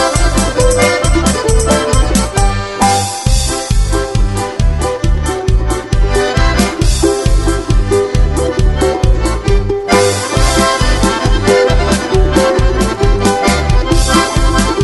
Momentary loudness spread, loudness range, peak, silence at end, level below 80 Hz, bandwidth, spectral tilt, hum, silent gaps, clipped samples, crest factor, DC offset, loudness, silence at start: 4 LU; 3 LU; 0 dBFS; 0 s; -14 dBFS; 12 kHz; -4.5 dB/octave; none; none; under 0.1%; 10 dB; 0.3%; -12 LUFS; 0 s